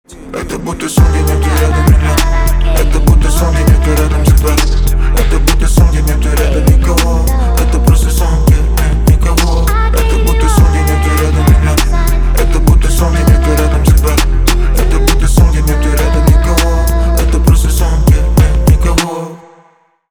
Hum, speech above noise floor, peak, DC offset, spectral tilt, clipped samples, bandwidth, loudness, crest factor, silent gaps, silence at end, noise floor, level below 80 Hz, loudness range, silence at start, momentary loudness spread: none; 39 dB; 0 dBFS; under 0.1%; -5.5 dB/octave; under 0.1%; 19.5 kHz; -11 LUFS; 8 dB; none; 0.75 s; -49 dBFS; -10 dBFS; 1 LU; 0.1 s; 4 LU